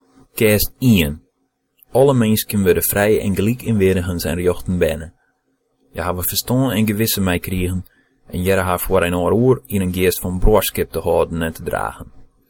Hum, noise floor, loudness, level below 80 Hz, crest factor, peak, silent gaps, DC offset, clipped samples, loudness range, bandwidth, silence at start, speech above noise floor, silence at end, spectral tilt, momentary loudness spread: none; -68 dBFS; -18 LUFS; -32 dBFS; 16 dB; -2 dBFS; none; under 0.1%; under 0.1%; 4 LU; 17.5 kHz; 0.35 s; 51 dB; 0.25 s; -5.5 dB/octave; 9 LU